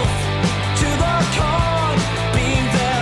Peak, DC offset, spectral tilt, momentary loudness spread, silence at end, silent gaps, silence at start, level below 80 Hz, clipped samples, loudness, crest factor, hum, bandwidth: -6 dBFS; under 0.1%; -5 dB/octave; 2 LU; 0 s; none; 0 s; -28 dBFS; under 0.1%; -18 LUFS; 12 dB; none; 12 kHz